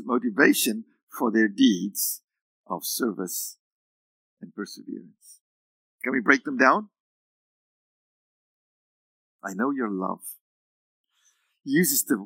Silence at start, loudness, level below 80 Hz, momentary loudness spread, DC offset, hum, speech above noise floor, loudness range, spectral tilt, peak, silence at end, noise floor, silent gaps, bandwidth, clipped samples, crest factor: 0 s; -24 LUFS; under -90 dBFS; 19 LU; under 0.1%; none; 44 dB; 9 LU; -3.5 dB/octave; -2 dBFS; 0 s; -68 dBFS; 1.03-1.07 s, 2.24-2.28 s, 2.41-2.64 s, 3.60-4.37 s, 5.41-5.99 s, 7.00-9.39 s, 10.41-11.04 s; 16.5 kHz; under 0.1%; 26 dB